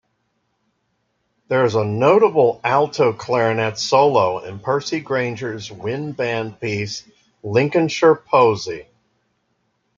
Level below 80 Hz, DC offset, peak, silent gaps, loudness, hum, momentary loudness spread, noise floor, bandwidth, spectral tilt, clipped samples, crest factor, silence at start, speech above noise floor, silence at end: -62 dBFS; under 0.1%; -2 dBFS; none; -18 LUFS; none; 13 LU; -69 dBFS; 7.6 kHz; -5.5 dB/octave; under 0.1%; 18 dB; 1.5 s; 52 dB; 1.15 s